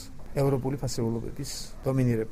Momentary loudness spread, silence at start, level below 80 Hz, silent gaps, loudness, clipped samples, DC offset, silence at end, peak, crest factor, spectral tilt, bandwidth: 9 LU; 0 s; -44 dBFS; none; -30 LUFS; under 0.1%; under 0.1%; 0 s; -12 dBFS; 16 dB; -6.5 dB/octave; 16 kHz